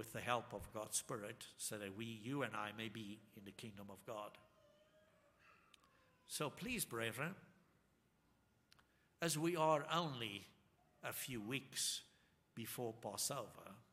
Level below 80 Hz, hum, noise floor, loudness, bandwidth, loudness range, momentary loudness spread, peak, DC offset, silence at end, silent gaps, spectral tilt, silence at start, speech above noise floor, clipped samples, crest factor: -76 dBFS; none; -78 dBFS; -45 LUFS; 15.5 kHz; 10 LU; 16 LU; -22 dBFS; under 0.1%; 0.1 s; none; -3.5 dB/octave; 0 s; 33 dB; under 0.1%; 24 dB